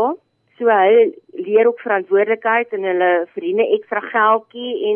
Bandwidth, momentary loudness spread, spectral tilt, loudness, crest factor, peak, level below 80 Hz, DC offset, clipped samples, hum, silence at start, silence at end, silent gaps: 3.5 kHz; 8 LU; -8.5 dB/octave; -17 LUFS; 14 dB; -4 dBFS; -80 dBFS; under 0.1%; under 0.1%; none; 0 s; 0 s; none